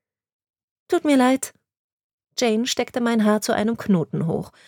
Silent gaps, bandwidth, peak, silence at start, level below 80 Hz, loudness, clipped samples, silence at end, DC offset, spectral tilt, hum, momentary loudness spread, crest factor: 1.79-2.18 s; 18.5 kHz; -6 dBFS; 0.9 s; -62 dBFS; -21 LUFS; under 0.1%; 0.2 s; under 0.1%; -5 dB/octave; none; 7 LU; 16 dB